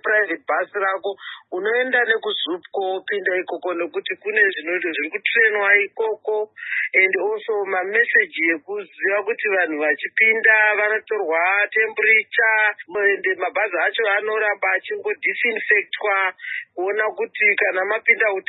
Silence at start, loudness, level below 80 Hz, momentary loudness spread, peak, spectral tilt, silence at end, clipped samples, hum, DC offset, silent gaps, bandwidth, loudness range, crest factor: 0.05 s; -19 LUFS; -84 dBFS; 10 LU; -2 dBFS; -7 dB/octave; 0.1 s; under 0.1%; none; under 0.1%; none; 4.1 kHz; 5 LU; 18 dB